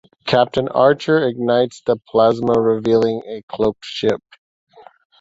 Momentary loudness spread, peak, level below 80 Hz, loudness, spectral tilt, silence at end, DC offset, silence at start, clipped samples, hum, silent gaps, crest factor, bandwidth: 7 LU; -2 dBFS; -52 dBFS; -17 LUFS; -6.5 dB/octave; 1.05 s; under 0.1%; 0.25 s; under 0.1%; none; 3.43-3.48 s; 16 dB; 7.8 kHz